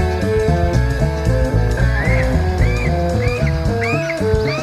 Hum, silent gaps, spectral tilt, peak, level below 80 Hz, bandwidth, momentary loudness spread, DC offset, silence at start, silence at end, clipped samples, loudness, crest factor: none; none; -7 dB/octave; -2 dBFS; -20 dBFS; 14.5 kHz; 2 LU; under 0.1%; 0 s; 0 s; under 0.1%; -17 LUFS; 14 dB